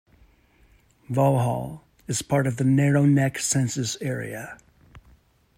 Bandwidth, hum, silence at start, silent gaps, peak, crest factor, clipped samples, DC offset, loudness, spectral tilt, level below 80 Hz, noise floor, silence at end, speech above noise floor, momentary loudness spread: 14.5 kHz; none; 1.1 s; none; -8 dBFS; 16 dB; under 0.1%; under 0.1%; -23 LUFS; -5.5 dB/octave; -58 dBFS; -58 dBFS; 0.6 s; 36 dB; 16 LU